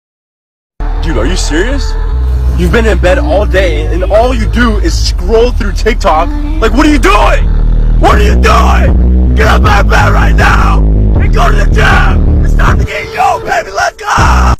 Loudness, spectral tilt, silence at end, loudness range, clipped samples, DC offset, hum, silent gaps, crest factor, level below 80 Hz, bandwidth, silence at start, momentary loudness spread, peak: -9 LUFS; -6 dB/octave; 0 s; 3 LU; 1%; under 0.1%; none; none; 6 dB; -10 dBFS; 13.5 kHz; 0.8 s; 6 LU; 0 dBFS